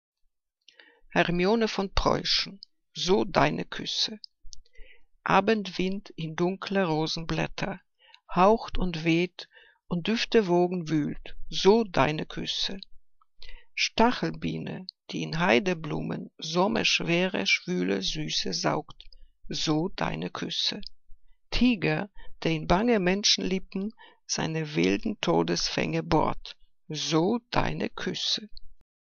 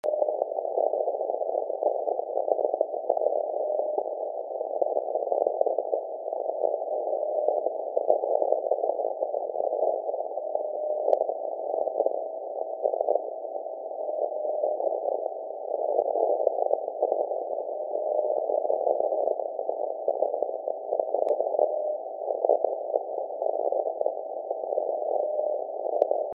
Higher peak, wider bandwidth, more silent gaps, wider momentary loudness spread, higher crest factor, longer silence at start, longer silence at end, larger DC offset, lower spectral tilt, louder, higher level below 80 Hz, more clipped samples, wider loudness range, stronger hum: about the same, -6 dBFS vs -6 dBFS; first, 7.4 kHz vs 1.3 kHz; neither; first, 12 LU vs 6 LU; about the same, 22 dB vs 22 dB; first, 1.1 s vs 0.05 s; first, 0.35 s vs 0 s; neither; first, -4.5 dB/octave vs -0.5 dB/octave; about the same, -27 LUFS vs -28 LUFS; first, -44 dBFS vs under -90 dBFS; neither; about the same, 3 LU vs 2 LU; neither